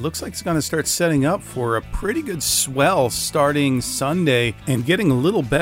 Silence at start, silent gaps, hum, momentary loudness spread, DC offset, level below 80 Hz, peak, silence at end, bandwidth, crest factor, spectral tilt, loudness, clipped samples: 0 s; none; none; 6 LU; under 0.1%; -40 dBFS; -4 dBFS; 0 s; 16 kHz; 16 dB; -4.5 dB/octave; -19 LUFS; under 0.1%